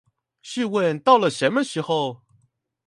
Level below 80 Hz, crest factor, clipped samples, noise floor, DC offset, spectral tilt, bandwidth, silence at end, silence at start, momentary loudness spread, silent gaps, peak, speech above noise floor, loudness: -72 dBFS; 22 dB; under 0.1%; -65 dBFS; under 0.1%; -5 dB/octave; 11.5 kHz; 0.7 s; 0.45 s; 11 LU; none; -2 dBFS; 44 dB; -21 LUFS